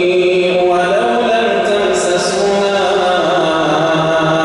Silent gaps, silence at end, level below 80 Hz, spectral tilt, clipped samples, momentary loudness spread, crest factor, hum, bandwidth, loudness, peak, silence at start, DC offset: none; 0 s; -48 dBFS; -4.5 dB/octave; under 0.1%; 1 LU; 10 dB; none; 11.5 kHz; -13 LUFS; -2 dBFS; 0 s; under 0.1%